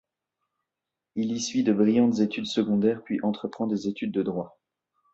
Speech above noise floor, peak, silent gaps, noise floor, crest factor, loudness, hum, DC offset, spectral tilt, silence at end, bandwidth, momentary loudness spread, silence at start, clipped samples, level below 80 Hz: 62 dB; -10 dBFS; none; -87 dBFS; 16 dB; -26 LUFS; none; under 0.1%; -5.5 dB/octave; 0.65 s; 8 kHz; 10 LU; 1.15 s; under 0.1%; -66 dBFS